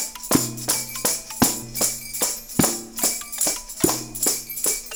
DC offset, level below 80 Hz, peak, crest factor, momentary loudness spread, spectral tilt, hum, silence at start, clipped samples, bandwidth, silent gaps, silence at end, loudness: 0.2%; -48 dBFS; -2 dBFS; 22 dB; 2 LU; -2.5 dB/octave; none; 0 s; under 0.1%; over 20 kHz; none; 0 s; -22 LUFS